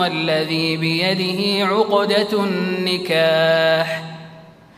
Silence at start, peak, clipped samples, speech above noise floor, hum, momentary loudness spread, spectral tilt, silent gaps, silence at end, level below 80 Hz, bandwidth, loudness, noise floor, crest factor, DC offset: 0 s; -4 dBFS; under 0.1%; 24 dB; none; 5 LU; -5 dB/octave; none; 0.3 s; -64 dBFS; 15.5 kHz; -18 LUFS; -42 dBFS; 16 dB; under 0.1%